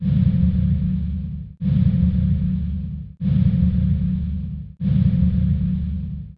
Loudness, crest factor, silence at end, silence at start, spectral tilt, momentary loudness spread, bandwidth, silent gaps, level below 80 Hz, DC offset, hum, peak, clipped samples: -21 LUFS; 12 dB; 0.05 s; 0 s; -12.5 dB/octave; 11 LU; 4.3 kHz; none; -28 dBFS; under 0.1%; none; -6 dBFS; under 0.1%